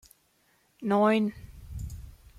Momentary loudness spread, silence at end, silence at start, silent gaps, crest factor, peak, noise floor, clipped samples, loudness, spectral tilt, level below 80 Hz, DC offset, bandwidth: 22 LU; 0.25 s; 0.8 s; none; 18 dB; -14 dBFS; -68 dBFS; under 0.1%; -26 LUFS; -7 dB/octave; -48 dBFS; under 0.1%; 14.5 kHz